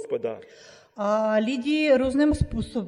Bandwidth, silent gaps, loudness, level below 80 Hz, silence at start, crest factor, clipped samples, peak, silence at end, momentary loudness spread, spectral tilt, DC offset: 11.5 kHz; none; -24 LUFS; -40 dBFS; 0 s; 16 dB; under 0.1%; -8 dBFS; 0 s; 10 LU; -6.5 dB/octave; under 0.1%